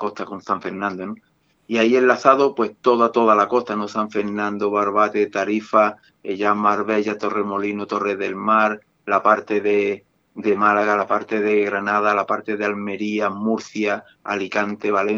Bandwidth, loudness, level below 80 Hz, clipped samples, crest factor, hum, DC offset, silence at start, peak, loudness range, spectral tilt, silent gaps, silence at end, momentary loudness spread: 7.4 kHz; -20 LUFS; -72 dBFS; under 0.1%; 20 dB; none; under 0.1%; 0 s; 0 dBFS; 3 LU; -5.5 dB/octave; none; 0 s; 10 LU